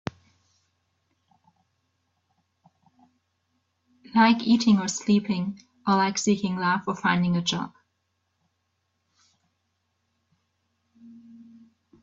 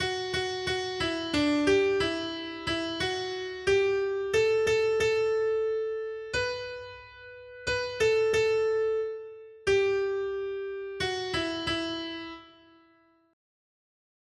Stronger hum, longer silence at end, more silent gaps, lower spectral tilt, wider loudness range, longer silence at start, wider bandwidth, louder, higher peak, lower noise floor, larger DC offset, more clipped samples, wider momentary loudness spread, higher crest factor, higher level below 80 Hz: neither; second, 0.9 s vs 1.85 s; neither; about the same, -4.5 dB/octave vs -4 dB/octave; about the same, 7 LU vs 6 LU; first, 4.15 s vs 0 s; second, 7.8 kHz vs 12 kHz; first, -24 LUFS vs -28 LUFS; first, -6 dBFS vs -12 dBFS; first, -76 dBFS vs -63 dBFS; neither; neither; about the same, 12 LU vs 12 LU; first, 22 dB vs 16 dB; second, -66 dBFS vs -56 dBFS